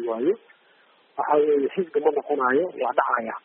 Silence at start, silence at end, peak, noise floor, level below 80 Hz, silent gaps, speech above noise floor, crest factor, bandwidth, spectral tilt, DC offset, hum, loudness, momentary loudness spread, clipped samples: 0 s; 0.05 s; -6 dBFS; -59 dBFS; -76 dBFS; none; 36 dB; 16 dB; 3.7 kHz; -4 dB/octave; under 0.1%; none; -23 LUFS; 7 LU; under 0.1%